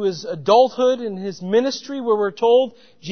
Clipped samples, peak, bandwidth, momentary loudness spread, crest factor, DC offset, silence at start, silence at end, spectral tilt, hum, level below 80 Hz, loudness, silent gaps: under 0.1%; -2 dBFS; 6.6 kHz; 12 LU; 16 dB; 0.3%; 0 s; 0 s; -5 dB/octave; none; -70 dBFS; -19 LUFS; none